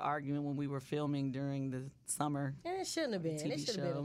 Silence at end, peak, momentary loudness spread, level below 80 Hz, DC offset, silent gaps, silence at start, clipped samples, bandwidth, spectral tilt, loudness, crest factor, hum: 0 s; -20 dBFS; 4 LU; -72 dBFS; under 0.1%; none; 0 s; under 0.1%; 15 kHz; -5 dB/octave; -38 LUFS; 18 dB; none